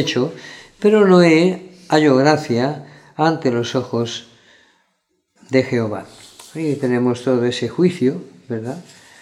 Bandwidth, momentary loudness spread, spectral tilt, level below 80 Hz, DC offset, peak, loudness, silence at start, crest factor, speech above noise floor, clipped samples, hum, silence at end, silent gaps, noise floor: 12.5 kHz; 18 LU; -6 dB/octave; -64 dBFS; under 0.1%; 0 dBFS; -17 LUFS; 0 s; 18 dB; 52 dB; under 0.1%; none; 0.4 s; none; -68 dBFS